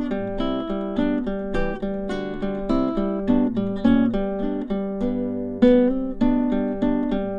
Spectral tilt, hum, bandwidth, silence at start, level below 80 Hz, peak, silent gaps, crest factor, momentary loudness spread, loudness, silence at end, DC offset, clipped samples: -8.5 dB/octave; none; 6.6 kHz; 0 s; -34 dBFS; -4 dBFS; none; 18 dB; 8 LU; -23 LUFS; 0 s; under 0.1%; under 0.1%